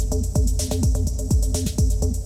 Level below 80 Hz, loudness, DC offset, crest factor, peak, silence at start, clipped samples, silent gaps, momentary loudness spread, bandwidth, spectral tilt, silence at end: -22 dBFS; -23 LUFS; under 0.1%; 10 dB; -10 dBFS; 0 s; under 0.1%; none; 1 LU; 15.5 kHz; -6 dB/octave; 0 s